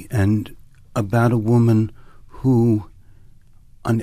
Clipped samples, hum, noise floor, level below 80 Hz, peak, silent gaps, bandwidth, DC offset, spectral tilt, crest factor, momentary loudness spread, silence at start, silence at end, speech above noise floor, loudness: under 0.1%; none; -46 dBFS; -46 dBFS; -6 dBFS; none; 14.5 kHz; under 0.1%; -8.5 dB/octave; 14 dB; 12 LU; 0 s; 0 s; 29 dB; -19 LUFS